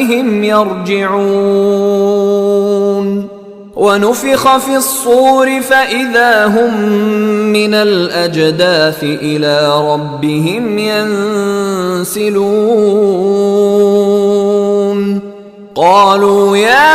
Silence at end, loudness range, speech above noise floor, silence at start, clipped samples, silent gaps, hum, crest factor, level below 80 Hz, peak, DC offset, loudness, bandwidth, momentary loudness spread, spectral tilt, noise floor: 0 s; 3 LU; 20 dB; 0 s; under 0.1%; none; none; 10 dB; -52 dBFS; 0 dBFS; under 0.1%; -10 LUFS; 16 kHz; 7 LU; -4.5 dB/octave; -30 dBFS